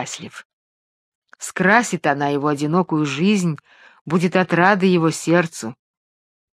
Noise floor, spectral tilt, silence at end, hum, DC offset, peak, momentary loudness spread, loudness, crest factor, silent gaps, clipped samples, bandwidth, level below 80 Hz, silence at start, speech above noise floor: under -90 dBFS; -5.5 dB/octave; 0.8 s; none; under 0.1%; 0 dBFS; 16 LU; -18 LUFS; 20 dB; 0.45-1.22 s, 4.01-4.05 s; under 0.1%; 14 kHz; -66 dBFS; 0 s; over 71 dB